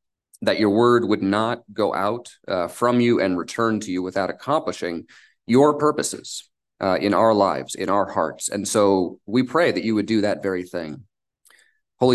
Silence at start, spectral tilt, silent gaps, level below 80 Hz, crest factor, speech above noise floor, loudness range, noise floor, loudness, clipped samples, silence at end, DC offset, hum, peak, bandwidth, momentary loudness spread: 0.4 s; -5 dB/octave; none; -58 dBFS; 18 dB; 38 dB; 2 LU; -59 dBFS; -21 LUFS; under 0.1%; 0 s; under 0.1%; none; -4 dBFS; 12.5 kHz; 11 LU